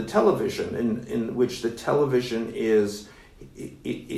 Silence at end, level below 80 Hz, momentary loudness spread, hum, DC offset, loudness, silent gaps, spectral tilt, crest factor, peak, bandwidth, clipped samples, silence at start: 0 s; -54 dBFS; 13 LU; none; under 0.1%; -25 LUFS; none; -6 dB/octave; 18 dB; -8 dBFS; 13.5 kHz; under 0.1%; 0 s